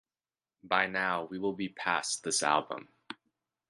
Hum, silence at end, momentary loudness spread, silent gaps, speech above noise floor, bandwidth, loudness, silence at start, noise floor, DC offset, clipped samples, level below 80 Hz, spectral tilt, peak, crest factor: none; 0.55 s; 19 LU; none; over 58 dB; 11.5 kHz; -31 LUFS; 0.65 s; under -90 dBFS; under 0.1%; under 0.1%; -74 dBFS; -2 dB/octave; -10 dBFS; 24 dB